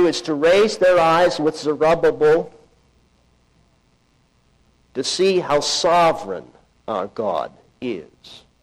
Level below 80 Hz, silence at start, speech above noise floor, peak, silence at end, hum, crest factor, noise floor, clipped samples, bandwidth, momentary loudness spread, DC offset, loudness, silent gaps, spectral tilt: -52 dBFS; 0 s; 42 dB; -8 dBFS; 0.25 s; none; 12 dB; -60 dBFS; under 0.1%; 13 kHz; 17 LU; under 0.1%; -18 LUFS; none; -4 dB/octave